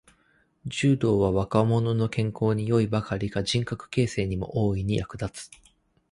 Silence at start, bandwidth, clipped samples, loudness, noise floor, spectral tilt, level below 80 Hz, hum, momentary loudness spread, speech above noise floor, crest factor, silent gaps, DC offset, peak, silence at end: 0.65 s; 11.5 kHz; under 0.1%; -26 LUFS; -65 dBFS; -6.5 dB/octave; -46 dBFS; none; 12 LU; 40 dB; 18 dB; none; under 0.1%; -8 dBFS; 0.65 s